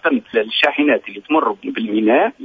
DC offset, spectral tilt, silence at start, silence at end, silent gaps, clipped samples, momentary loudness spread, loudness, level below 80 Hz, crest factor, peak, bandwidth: under 0.1%; -6 dB/octave; 0.05 s; 0 s; none; under 0.1%; 6 LU; -17 LUFS; -64 dBFS; 16 dB; 0 dBFS; 8 kHz